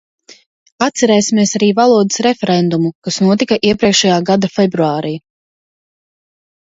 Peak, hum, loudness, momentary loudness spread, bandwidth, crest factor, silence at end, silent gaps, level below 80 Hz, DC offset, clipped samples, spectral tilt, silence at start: 0 dBFS; none; -13 LUFS; 7 LU; 8 kHz; 14 dB; 1.45 s; 2.95-3.02 s; -54 dBFS; under 0.1%; under 0.1%; -4.5 dB/octave; 0.8 s